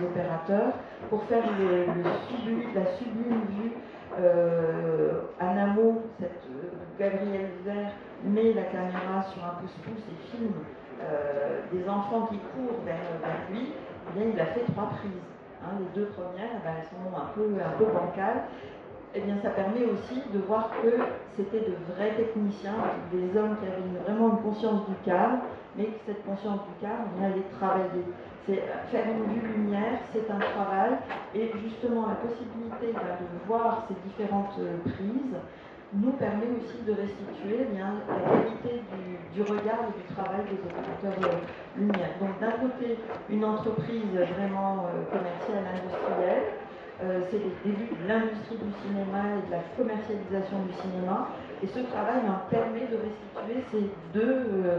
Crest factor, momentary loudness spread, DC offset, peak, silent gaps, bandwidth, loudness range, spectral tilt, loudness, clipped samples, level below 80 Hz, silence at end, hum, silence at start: 20 dB; 11 LU; under 0.1%; -10 dBFS; none; 6.6 kHz; 4 LU; -8.5 dB/octave; -30 LUFS; under 0.1%; -64 dBFS; 0 s; none; 0 s